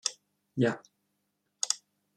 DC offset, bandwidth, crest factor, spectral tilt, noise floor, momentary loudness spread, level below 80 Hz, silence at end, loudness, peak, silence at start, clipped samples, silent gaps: under 0.1%; 14 kHz; 26 dB; -3.5 dB/octave; -79 dBFS; 11 LU; -78 dBFS; 0.4 s; -32 LUFS; -8 dBFS; 0.05 s; under 0.1%; none